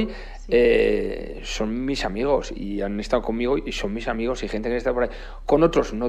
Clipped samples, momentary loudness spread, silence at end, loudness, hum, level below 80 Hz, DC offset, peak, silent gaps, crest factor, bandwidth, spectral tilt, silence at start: under 0.1%; 11 LU; 0 s; -23 LUFS; none; -34 dBFS; under 0.1%; -4 dBFS; none; 18 dB; 10.5 kHz; -5.5 dB/octave; 0 s